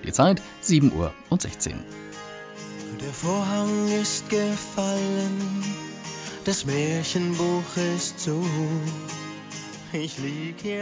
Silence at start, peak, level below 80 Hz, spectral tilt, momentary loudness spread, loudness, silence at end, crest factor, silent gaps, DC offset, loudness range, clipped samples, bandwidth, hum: 0 s; -6 dBFS; -50 dBFS; -5 dB/octave; 15 LU; -26 LUFS; 0 s; 20 dB; none; under 0.1%; 2 LU; under 0.1%; 8 kHz; none